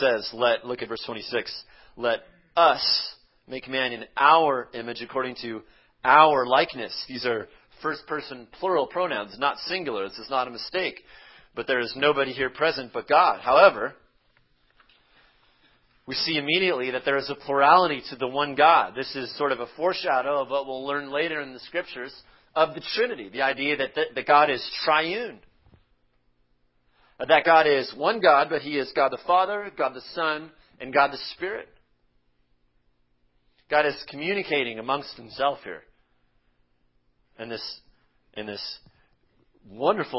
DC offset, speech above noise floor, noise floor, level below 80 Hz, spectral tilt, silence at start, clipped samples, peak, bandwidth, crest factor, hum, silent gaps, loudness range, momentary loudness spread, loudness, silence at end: under 0.1%; 42 dB; -67 dBFS; -64 dBFS; -7 dB/octave; 0 s; under 0.1%; -2 dBFS; 5.8 kHz; 24 dB; none; none; 9 LU; 17 LU; -24 LUFS; 0 s